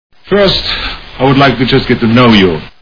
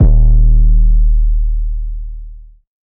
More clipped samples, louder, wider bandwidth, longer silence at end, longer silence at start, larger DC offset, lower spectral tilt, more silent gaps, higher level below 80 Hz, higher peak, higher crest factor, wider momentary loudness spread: first, 0.5% vs under 0.1%; first, -9 LUFS vs -15 LUFS; first, 5.4 kHz vs 0.9 kHz; second, 0.1 s vs 0.5 s; first, 0.25 s vs 0 s; first, 1% vs under 0.1%; second, -7 dB/octave vs -14.5 dB/octave; neither; second, -28 dBFS vs -10 dBFS; about the same, 0 dBFS vs 0 dBFS; about the same, 10 dB vs 10 dB; second, 9 LU vs 16 LU